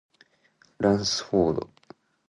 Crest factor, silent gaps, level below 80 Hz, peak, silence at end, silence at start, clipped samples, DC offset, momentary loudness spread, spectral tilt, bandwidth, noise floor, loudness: 18 dB; none; -54 dBFS; -10 dBFS; 0.65 s; 0.8 s; under 0.1%; under 0.1%; 9 LU; -5 dB/octave; 11 kHz; -63 dBFS; -25 LUFS